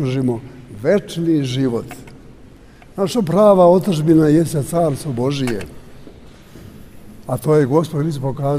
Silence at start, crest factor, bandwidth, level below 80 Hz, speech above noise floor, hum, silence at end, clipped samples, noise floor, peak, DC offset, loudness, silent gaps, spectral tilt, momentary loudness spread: 0 s; 16 dB; 15.5 kHz; -46 dBFS; 26 dB; none; 0 s; under 0.1%; -42 dBFS; -2 dBFS; under 0.1%; -17 LUFS; none; -7 dB/octave; 15 LU